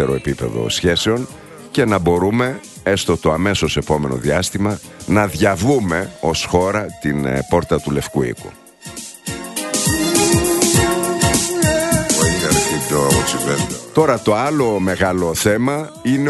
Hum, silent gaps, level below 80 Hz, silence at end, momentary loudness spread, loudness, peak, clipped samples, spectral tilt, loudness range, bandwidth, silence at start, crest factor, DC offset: none; none; -36 dBFS; 0 s; 9 LU; -17 LUFS; 0 dBFS; under 0.1%; -4 dB/octave; 5 LU; 12.5 kHz; 0 s; 16 dB; under 0.1%